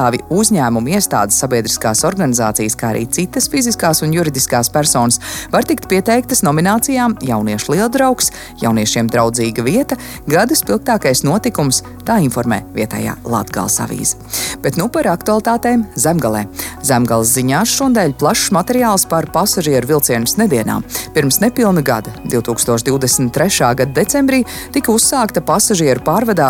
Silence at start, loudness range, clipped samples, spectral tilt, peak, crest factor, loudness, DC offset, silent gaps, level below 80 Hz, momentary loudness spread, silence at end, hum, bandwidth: 0 s; 3 LU; under 0.1%; -4 dB/octave; 0 dBFS; 14 dB; -14 LUFS; under 0.1%; none; -40 dBFS; 6 LU; 0 s; none; 17.5 kHz